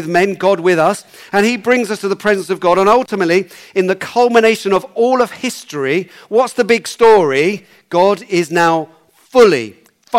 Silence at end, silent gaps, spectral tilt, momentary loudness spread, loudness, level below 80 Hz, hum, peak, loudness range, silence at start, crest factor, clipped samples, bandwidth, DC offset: 0 s; none; -4.5 dB/octave; 9 LU; -14 LUFS; -54 dBFS; none; -2 dBFS; 1 LU; 0 s; 12 dB; under 0.1%; 16 kHz; under 0.1%